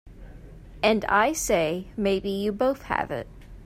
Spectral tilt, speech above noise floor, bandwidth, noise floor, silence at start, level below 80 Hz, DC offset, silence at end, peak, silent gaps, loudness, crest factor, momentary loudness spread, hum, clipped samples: -4 dB/octave; 20 dB; 16 kHz; -44 dBFS; 0.05 s; -46 dBFS; under 0.1%; 0 s; -6 dBFS; none; -25 LUFS; 20 dB; 8 LU; none; under 0.1%